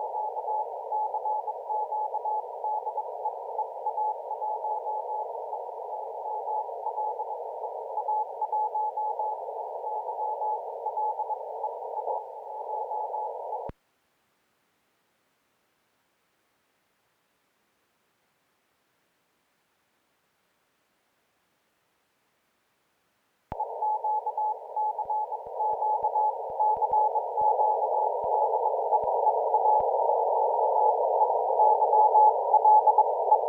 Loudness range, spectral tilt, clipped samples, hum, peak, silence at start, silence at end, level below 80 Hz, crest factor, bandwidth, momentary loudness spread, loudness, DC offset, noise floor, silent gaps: 13 LU; -7 dB/octave; under 0.1%; none; -10 dBFS; 0 s; 0 s; -68 dBFS; 20 dB; 2.4 kHz; 13 LU; -27 LUFS; under 0.1%; -72 dBFS; none